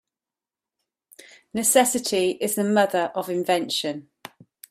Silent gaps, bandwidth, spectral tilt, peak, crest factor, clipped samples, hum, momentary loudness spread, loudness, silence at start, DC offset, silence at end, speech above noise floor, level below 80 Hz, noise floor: none; 16 kHz; -3 dB/octave; -4 dBFS; 20 dB; under 0.1%; none; 10 LU; -22 LUFS; 1.55 s; under 0.1%; 0.7 s; over 68 dB; -70 dBFS; under -90 dBFS